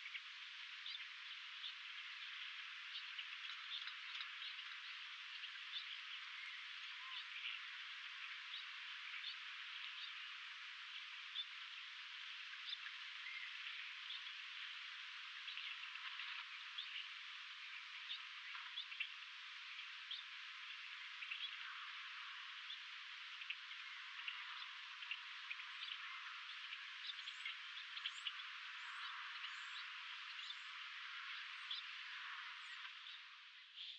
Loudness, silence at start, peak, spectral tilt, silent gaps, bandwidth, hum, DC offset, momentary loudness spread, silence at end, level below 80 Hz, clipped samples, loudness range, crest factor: -49 LUFS; 0 s; -30 dBFS; 7 dB/octave; none; 8.8 kHz; none; under 0.1%; 4 LU; 0 s; under -90 dBFS; under 0.1%; 1 LU; 20 dB